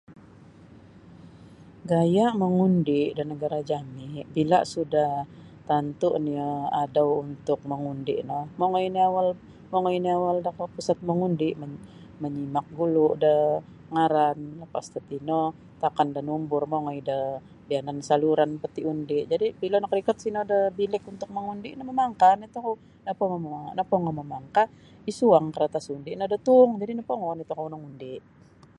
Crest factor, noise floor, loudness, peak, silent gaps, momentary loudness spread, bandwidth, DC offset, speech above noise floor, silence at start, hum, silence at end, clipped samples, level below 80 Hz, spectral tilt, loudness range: 20 dB; -50 dBFS; -26 LUFS; -4 dBFS; none; 14 LU; 11 kHz; under 0.1%; 25 dB; 0.1 s; none; 0.6 s; under 0.1%; -62 dBFS; -7 dB/octave; 3 LU